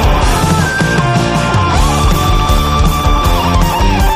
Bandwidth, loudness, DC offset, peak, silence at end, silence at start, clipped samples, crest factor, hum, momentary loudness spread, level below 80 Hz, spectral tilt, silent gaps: 15.5 kHz; -12 LUFS; under 0.1%; 0 dBFS; 0 s; 0 s; under 0.1%; 10 dB; none; 1 LU; -14 dBFS; -5 dB/octave; none